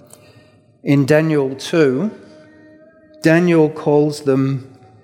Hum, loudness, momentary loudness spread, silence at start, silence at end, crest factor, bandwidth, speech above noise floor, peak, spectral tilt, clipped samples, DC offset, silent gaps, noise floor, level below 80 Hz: none; -16 LUFS; 9 LU; 0.85 s; 0.35 s; 16 dB; 16 kHz; 34 dB; 0 dBFS; -7 dB/octave; under 0.1%; under 0.1%; none; -49 dBFS; -64 dBFS